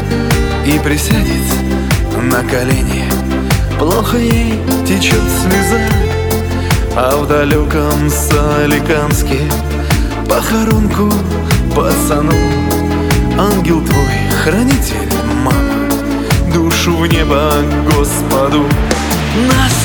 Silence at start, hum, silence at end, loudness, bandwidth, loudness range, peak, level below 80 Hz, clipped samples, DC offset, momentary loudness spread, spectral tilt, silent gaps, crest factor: 0 s; none; 0 s; -12 LUFS; 19.5 kHz; 1 LU; 0 dBFS; -20 dBFS; under 0.1%; under 0.1%; 3 LU; -5 dB/octave; none; 12 dB